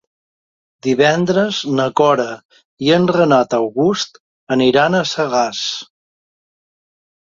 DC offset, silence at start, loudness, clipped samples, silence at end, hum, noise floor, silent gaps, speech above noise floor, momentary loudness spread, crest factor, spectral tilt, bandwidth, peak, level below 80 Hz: under 0.1%; 0.85 s; -16 LUFS; under 0.1%; 1.4 s; none; under -90 dBFS; 2.45-2.49 s, 2.65-2.77 s, 4.20-4.47 s; over 75 dB; 10 LU; 16 dB; -5 dB/octave; 7.6 kHz; -2 dBFS; -58 dBFS